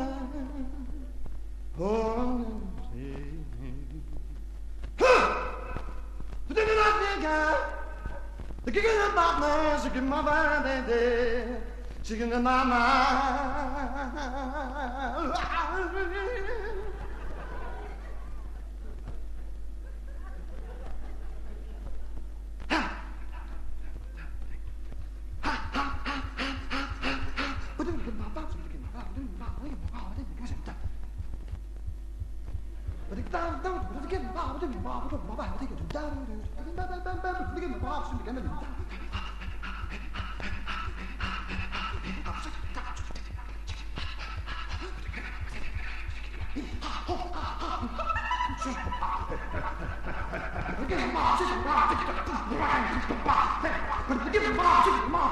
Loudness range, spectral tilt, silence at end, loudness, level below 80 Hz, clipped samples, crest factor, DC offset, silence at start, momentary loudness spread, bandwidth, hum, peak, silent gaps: 13 LU; -5.5 dB/octave; 0 s; -31 LUFS; -38 dBFS; under 0.1%; 22 dB; under 0.1%; 0 s; 18 LU; 11.5 kHz; none; -8 dBFS; none